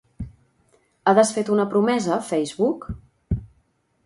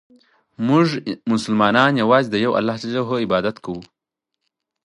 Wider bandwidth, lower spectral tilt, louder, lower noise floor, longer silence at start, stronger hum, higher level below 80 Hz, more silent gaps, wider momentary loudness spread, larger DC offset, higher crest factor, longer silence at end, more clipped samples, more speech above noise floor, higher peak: about the same, 11.5 kHz vs 11.5 kHz; about the same, -5.5 dB/octave vs -6 dB/octave; second, -22 LUFS vs -19 LUFS; second, -65 dBFS vs -81 dBFS; second, 0.2 s vs 0.6 s; neither; first, -42 dBFS vs -58 dBFS; neither; first, 21 LU vs 11 LU; neither; about the same, 20 dB vs 20 dB; second, 0.6 s vs 1 s; neither; second, 45 dB vs 62 dB; about the same, -2 dBFS vs 0 dBFS